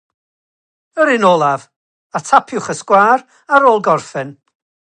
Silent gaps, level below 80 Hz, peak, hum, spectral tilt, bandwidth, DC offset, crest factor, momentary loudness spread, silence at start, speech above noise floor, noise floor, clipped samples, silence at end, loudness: 1.76-2.10 s; -60 dBFS; 0 dBFS; none; -4.5 dB/octave; 10 kHz; under 0.1%; 16 dB; 15 LU; 0.95 s; over 77 dB; under -90 dBFS; under 0.1%; 0.65 s; -13 LUFS